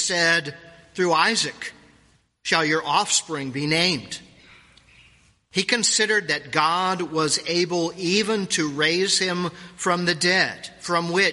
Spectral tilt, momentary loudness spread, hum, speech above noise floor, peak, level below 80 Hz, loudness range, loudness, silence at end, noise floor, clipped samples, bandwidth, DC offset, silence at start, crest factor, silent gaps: -2.5 dB/octave; 10 LU; none; 37 dB; -2 dBFS; -64 dBFS; 2 LU; -21 LUFS; 0 s; -60 dBFS; under 0.1%; 11.5 kHz; under 0.1%; 0 s; 20 dB; none